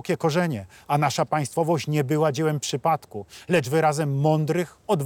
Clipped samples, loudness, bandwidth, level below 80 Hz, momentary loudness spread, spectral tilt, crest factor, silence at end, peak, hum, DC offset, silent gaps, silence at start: under 0.1%; -24 LUFS; 17.5 kHz; -66 dBFS; 6 LU; -6 dB/octave; 14 dB; 0 s; -10 dBFS; none; under 0.1%; none; 0.05 s